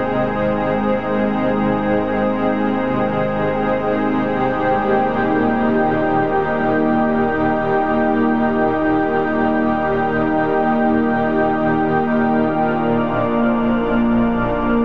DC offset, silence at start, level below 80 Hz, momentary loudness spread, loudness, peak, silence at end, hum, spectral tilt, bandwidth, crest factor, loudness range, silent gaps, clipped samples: 2%; 0 s; -38 dBFS; 2 LU; -17 LUFS; -4 dBFS; 0 s; none; -9 dB/octave; 5.4 kHz; 12 dB; 1 LU; none; under 0.1%